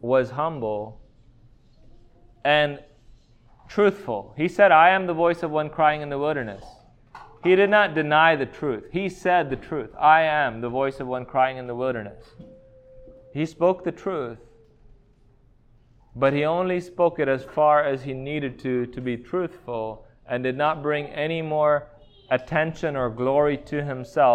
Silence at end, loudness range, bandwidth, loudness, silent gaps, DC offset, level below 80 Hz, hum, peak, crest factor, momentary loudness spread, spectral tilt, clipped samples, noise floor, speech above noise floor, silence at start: 0 s; 8 LU; 9.4 kHz; -23 LUFS; none; under 0.1%; -54 dBFS; none; -4 dBFS; 20 dB; 13 LU; -6.5 dB/octave; under 0.1%; -56 dBFS; 34 dB; 0.05 s